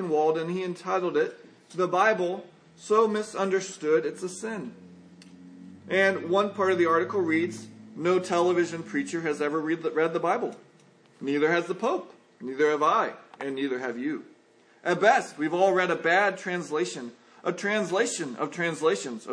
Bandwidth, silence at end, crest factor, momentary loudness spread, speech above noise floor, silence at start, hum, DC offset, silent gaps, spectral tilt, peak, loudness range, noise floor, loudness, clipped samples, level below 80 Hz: 10.5 kHz; 0 s; 22 dB; 12 LU; 33 dB; 0 s; none; under 0.1%; none; -4.5 dB/octave; -6 dBFS; 3 LU; -59 dBFS; -26 LUFS; under 0.1%; -84 dBFS